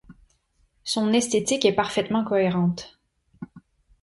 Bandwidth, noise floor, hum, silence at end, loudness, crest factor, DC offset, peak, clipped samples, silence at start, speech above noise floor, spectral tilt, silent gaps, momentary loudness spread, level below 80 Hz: 11.5 kHz; -66 dBFS; none; 0.45 s; -23 LUFS; 20 dB; under 0.1%; -6 dBFS; under 0.1%; 0.1 s; 43 dB; -4.5 dB/octave; none; 22 LU; -58 dBFS